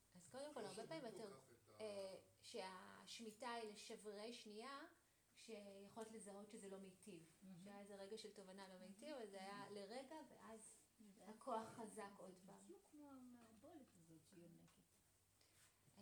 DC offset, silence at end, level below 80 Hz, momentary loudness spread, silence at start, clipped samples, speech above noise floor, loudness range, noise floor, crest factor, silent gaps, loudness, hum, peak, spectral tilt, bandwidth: under 0.1%; 0 s; under -90 dBFS; 12 LU; 0 s; under 0.1%; 22 dB; 7 LU; -80 dBFS; 22 dB; none; -58 LUFS; none; -36 dBFS; -3.5 dB/octave; over 20 kHz